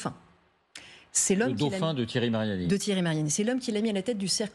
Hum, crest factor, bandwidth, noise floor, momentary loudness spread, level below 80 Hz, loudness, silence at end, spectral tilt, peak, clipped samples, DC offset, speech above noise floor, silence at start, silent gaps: none; 16 dB; 13.5 kHz; -63 dBFS; 7 LU; -64 dBFS; -28 LUFS; 0.05 s; -4 dB/octave; -14 dBFS; under 0.1%; under 0.1%; 36 dB; 0 s; none